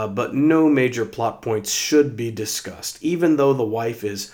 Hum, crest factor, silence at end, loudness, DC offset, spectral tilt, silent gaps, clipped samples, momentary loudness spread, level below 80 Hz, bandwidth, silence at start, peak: none; 16 dB; 0.05 s; -20 LUFS; under 0.1%; -4.5 dB/octave; none; under 0.1%; 10 LU; -62 dBFS; 19 kHz; 0 s; -4 dBFS